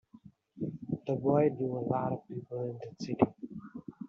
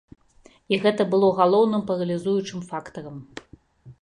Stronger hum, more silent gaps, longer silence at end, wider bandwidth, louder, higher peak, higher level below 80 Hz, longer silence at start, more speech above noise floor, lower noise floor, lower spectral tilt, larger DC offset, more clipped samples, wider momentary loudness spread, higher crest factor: neither; neither; about the same, 0 s vs 0.1 s; second, 7.4 kHz vs 10.5 kHz; second, -33 LUFS vs -22 LUFS; second, -10 dBFS vs -4 dBFS; second, -68 dBFS vs -62 dBFS; second, 0.15 s vs 0.7 s; second, 26 dB vs 33 dB; about the same, -58 dBFS vs -55 dBFS; first, -8.5 dB/octave vs -6.5 dB/octave; neither; neither; second, 16 LU vs 20 LU; about the same, 24 dB vs 20 dB